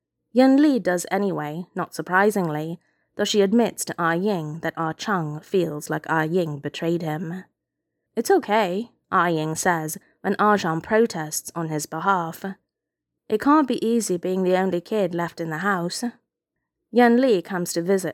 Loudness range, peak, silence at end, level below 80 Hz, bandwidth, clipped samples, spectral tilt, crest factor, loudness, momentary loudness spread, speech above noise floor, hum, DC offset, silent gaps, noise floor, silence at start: 3 LU; -4 dBFS; 0 s; -68 dBFS; 17.5 kHz; under 0.1%; -5 dB/octave; 18 dB; -23 LUFS; 11 LU; 62 dB; none; under 0.1%; none; -84 dBFS; 0.35 s